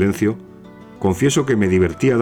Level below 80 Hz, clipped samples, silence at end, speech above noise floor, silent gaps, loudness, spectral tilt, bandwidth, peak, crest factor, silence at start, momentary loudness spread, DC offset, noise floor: -44 dBFS; under 0.1%; 0 s; 23 dB; none; -18 LUFS; -6 dB/octave; 17.5 kHz; -4 dBFS; 12 dB; 0 s; 6 LU; under 0.1%; -40 dBFS